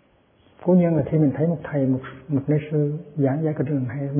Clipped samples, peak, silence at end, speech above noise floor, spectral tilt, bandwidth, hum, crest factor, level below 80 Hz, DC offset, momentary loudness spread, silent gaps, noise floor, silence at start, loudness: under 0.1%; -8 dBFS; 0 s; 37 dB; -13.5 dB/octave; 3.5 kHz; none; 14 dB; -56 dBFS; under 0.1%; 8 LU; none; -58 dBFS; 0.6 s; -22 LUFS